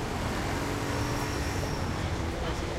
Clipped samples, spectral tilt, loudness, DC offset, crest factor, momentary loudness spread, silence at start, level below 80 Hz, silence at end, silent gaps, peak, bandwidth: under 0.1%; -5 dB/octave; -31 LUFS; under 0.1%; 12 dB; 2 LU; 0 s; -38 dBFS; 0 s; none; -18 dBFS; 16 kHz